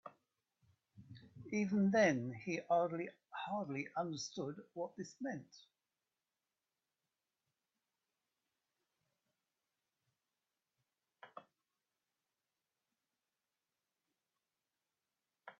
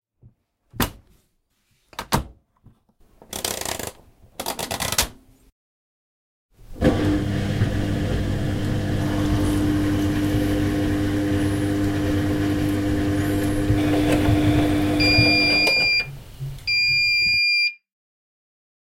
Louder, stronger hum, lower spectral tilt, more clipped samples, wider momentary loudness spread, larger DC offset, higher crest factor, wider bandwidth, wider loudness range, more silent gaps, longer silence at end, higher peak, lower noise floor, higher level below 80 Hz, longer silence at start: second, -39 LUFS vs -21 LUFS; neither; about the same, -5 dB/octave vs -4.5 dB/octave; neither; first, 25 LU vs 12 LU; neither; first, 26 dB vs 20 dB; second, 7.2 kHz vs 16.5 kHz; about the same, 14 LU vs 12 LU; second, none vs 5.52-6.49 s; second, 0.1 s vs 1.2 s; second, -18 dBFS vs -4 dBFS; first, under -90 dBFS vs -68 dBFS; second, -84 dBFS vs -34 dBFS; second, 0.05 s vs 0.75 s